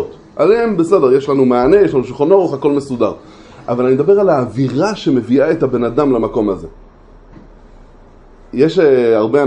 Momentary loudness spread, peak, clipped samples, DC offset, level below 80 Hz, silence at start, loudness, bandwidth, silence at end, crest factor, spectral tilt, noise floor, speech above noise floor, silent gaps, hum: 8 LU; 0 dBFS; under 0.1%; under 0.1%; -42 dBFS; 0 s; -13 LUFS; 9.8 kHz; 0 s; 14 dB; -7.5 dB/octave; -41 dBFS; 28 dB; none; none